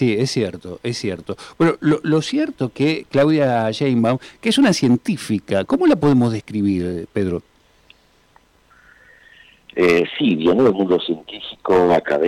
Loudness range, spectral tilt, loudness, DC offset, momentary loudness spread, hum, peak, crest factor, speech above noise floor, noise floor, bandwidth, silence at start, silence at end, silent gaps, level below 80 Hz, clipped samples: 6 LU; -6 dB/octave; -18 LUFS; under 0.1%; 11 LU; none; -8 dBFS; 10 dB; 37 dB; -55 dBFS; 14.5 kHz; 0 s; 0 s; none; -54 dBFS; under 0.1%